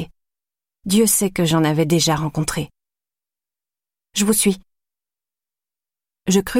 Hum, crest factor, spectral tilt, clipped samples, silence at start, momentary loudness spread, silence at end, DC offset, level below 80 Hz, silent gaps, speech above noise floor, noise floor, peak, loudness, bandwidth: none; 18 dB; -4 dB/octave; under 0.1%; 0 s; 14 LU; 0 s; under 0.1%; -48 dBFS; none; over 72 dB; under -90 dBFS; -4 dBFS; -18 LUFS; 16.5 kHz